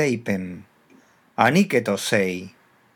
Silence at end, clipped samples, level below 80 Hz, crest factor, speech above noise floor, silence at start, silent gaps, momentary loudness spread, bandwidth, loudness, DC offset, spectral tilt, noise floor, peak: 0.45 s; under 0.1%; -70 dBFS; 22 dB; 34 dB; 0 s; none; 18 LU; 19.5 kHz; -21 LUFS; under 0.1%; -5 dB/octave; -55 dBFS; 0 dBFS